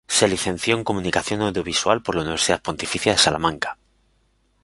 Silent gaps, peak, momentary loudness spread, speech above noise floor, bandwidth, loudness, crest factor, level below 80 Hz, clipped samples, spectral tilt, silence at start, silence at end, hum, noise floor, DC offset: none; -2 dBFS; 7 LU; 42 dB; 11.5 kHz; -21 LUFS; 20 dB; -46 dBFS; under 0.1%; -3 dB/octave; 0.1 s; 0.9 s; none; -64 dBFS; under 0.1%